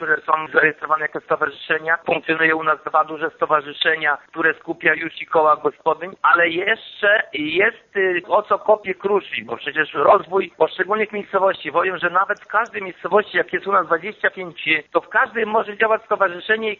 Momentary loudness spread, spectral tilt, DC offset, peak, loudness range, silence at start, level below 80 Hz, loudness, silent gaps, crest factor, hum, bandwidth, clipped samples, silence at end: 6 LU; -1 dB/octave; under 0.1%; 0 dBFS; 2 LU; 0 s; -64 dBFS; -19 LUFS; none; 18 dB; none; 6.8 kHz; under 0.1%; 0.05 s